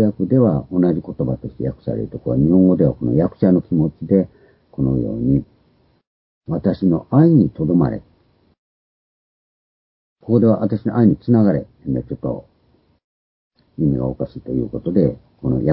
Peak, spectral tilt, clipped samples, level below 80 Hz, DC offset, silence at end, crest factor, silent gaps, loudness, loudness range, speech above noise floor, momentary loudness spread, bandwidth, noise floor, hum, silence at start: 0 dBFS; -14.5 dB/octave; under 0.1%; -42 dBFS; under 0.1%; 0 s; 18 dB; 6.07-6.41 s, 8.58-10.16 s, 13.04-13.51 s; -18 LUFS; 5 LU; 42 dB; 12 LU; 5 kHz; -59 dBFS; none; 0 s